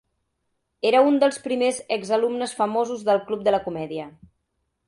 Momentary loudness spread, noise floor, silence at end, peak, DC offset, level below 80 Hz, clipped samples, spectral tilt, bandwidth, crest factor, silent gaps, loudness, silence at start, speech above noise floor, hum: 12 LU; -75 dBFS; 0.75 s; -6 dBFS; under 0.1%; -64 dBFS; under 0.1%; -4.5 dB/octave; 11.5 kHz; 18 dB; none; -22 LUFS; 0.85 s; 53 dB; none